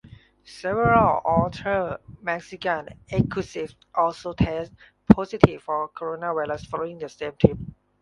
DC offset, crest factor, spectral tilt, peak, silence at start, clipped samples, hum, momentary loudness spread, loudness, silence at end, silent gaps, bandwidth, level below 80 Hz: under 0.1%; 24 dB; -8 dB/octave; 0 dBFS; 0.5 s; under 0.1%; none; 14 LU; -24 LUFS; 0.3 s; none; 11 kHz; -42 dBFS